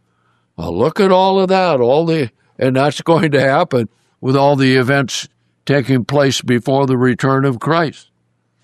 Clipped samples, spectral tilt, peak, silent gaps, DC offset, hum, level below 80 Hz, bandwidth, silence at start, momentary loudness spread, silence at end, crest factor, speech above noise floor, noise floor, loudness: under 0.1%; -6 dB/octave; -2 dBFS; none; under 0.1%; none; -56 dBFS; 13.5 kHz; 0.6 s; 11 LU; 0.7 s; 14 dB; 50 dB; -63 dBFS; -14 LUFS